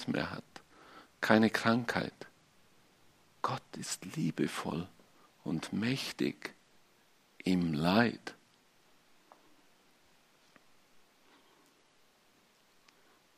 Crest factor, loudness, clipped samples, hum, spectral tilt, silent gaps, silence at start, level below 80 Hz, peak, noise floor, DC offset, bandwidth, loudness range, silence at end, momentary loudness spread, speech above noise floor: 30 dB; -33 LUFS; under 0.1%; none; -5 dB/octave; none; 0 s; -72 dBFS; -8 dBFS; -68 dBFS; under 0.1%; 15 kHz; 5 LU; 5.05 s; 23 LU; 35 dB